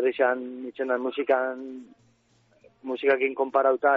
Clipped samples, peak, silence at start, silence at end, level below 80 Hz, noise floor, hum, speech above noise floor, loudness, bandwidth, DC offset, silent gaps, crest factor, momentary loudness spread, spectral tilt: under 0.1%; -8 dBFS; 0 s; 0 s; -74 dBFS; -64 dBFS; none; 39 dB; -26 LUFS; 5 kHz; under 0.1%; none; 18 dB; 15 LU; -1 dB/octave